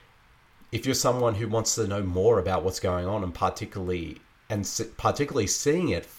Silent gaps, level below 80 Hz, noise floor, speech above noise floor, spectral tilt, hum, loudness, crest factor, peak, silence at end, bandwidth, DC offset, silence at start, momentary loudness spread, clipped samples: none; -50 dBFS; -58 dBFS; 32 dB; -4.5 dB/octave; none; -27 LUFS; 16 dB; -10 dBFS; 0 s; 17 kHz; under 0.1%; 0.7 s; 9 LU; under 0.1%